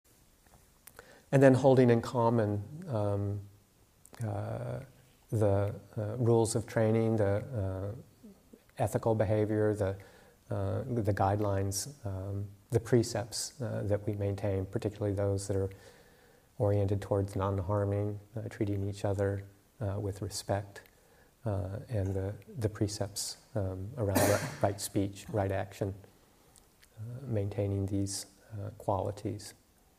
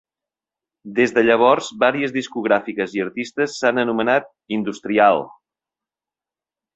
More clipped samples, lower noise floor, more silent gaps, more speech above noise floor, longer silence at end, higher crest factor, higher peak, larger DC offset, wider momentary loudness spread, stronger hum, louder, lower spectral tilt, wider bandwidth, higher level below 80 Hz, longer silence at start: neither; second, -64 dBFS vs -90 dBFS; neither; second, 33 dB vs 71 dB; second, 0.45 s vs 1.45 s; about the same, 22 dB vs 20 dB; second, -10 dBFS vs -2 dBFS; neither; about the same, 12 LU vs 10 LU; neither; second, -32 LUFS vs -19 LUFS; first, -6.5 dB/octave vs -5 dB/octave; first, 15.5 kHz vs 8.2 kHz; about the same, -62 dBFS vs -64 dBFS; first, 1 s vs 0.85 s